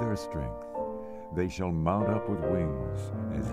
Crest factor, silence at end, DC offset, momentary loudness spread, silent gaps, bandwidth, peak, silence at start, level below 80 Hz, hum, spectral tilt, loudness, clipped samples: 16 dB; 0 s; under 0.1%; 9 LU; none; 14 kHz; -14 dBFS; 0 s; -46 dBFS; none; -8 dB/octave; -32 LUFS; under 0.1%